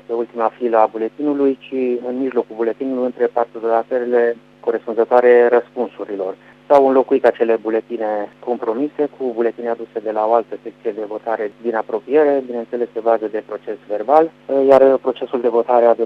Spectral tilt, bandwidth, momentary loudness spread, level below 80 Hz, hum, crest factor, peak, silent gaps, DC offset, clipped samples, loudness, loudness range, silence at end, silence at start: -7 dB/octave; 5.6 kHz; 12 LU; -68 dBFS; 50 Hz at -60 dBFS; 18 dB; 0 dBFS; none; under 0.1%; under 0.1%; -18 LUFS; 6 LU; 0 s; 0.1 s